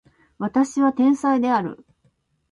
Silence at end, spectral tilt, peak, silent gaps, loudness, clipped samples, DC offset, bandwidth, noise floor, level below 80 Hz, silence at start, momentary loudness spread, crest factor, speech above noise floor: 0.75 s; -6 dB/octave; -6 dBFS; none; -20 LUFS; under 0.1%; under 0.1%; 11 kHz; -65 dBFS; -64 dBFS; 0.4 s; 9 LU; 16 dB; 46 dB